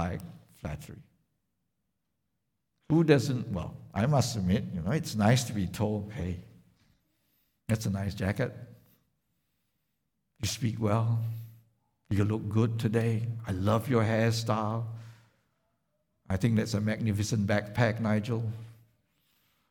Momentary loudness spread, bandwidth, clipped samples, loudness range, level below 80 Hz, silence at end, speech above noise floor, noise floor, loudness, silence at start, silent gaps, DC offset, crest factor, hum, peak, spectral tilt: 15 LU; 17 kHz; under 0.1%; 7 LU; -56 dBFS; 0.95 s; 53 dB; -82 dBFS; -30 LUFS; 0 s; none; under 0.1%; 22 dB; none; -10 dBFS; -6.5 dB/octave